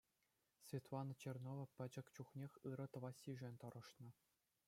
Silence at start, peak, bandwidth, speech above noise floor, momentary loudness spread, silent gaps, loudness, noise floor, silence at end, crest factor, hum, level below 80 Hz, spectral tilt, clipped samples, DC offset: 0.6 s; -36 dBFS; 16 kHz; 34 dB; 9 LU; none; -54 LUFS; -87 dBFS; 0.55 s; 18 dB; none; -90 dBFS; -7 dB/octave; under 0.1%; under 0.1%